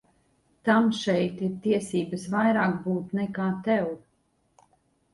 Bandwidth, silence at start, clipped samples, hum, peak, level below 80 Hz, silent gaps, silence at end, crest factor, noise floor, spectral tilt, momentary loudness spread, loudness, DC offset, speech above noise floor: 11.5 kHz; 0.65 s; under 0.1%; none; -10 dBFS; -66 dBFS; none; 1.15 s; 18 dB; -70 dBFS; -6.5 dB/octave; 8 LU; -26 LUFS; under 0.1%; 44 dB